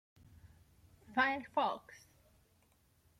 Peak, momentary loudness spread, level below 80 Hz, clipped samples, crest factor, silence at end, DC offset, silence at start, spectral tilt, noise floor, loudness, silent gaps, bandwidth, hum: -20 dBFS; 14 LU; -72 dBFS; under 0.1%; 20 dB; 1.25 s; under 0.1%; 0.45 s; -4.5 dB/octave; -72 dBFS; -36 LUFS; none; 16 kHz; none